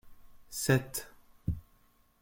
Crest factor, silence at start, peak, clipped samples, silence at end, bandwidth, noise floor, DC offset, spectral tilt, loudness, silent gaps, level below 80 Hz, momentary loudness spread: 24 dB; 0.05 s; -10 dBFS; under 0.1%; 0.6 s; 17 kHz; -66 dBFS; under 0.1%; -5 dB/octave; -34 LUFS; none; -52 dBFS; 14 LU